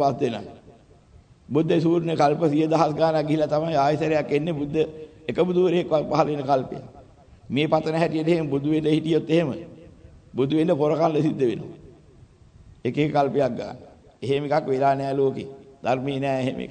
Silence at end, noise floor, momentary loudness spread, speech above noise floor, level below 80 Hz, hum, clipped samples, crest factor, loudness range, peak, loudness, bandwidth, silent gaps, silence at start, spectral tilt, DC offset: 0 s; -52 dBFS; 14 LU; 30 dB; -58 dBFS; none; under 0.1%; 18 dB; 4 LU; -6 dBFS; -23 LUFS; 9.2 kHz; none; 0 s; -7.5 dB/octave; under 0.1%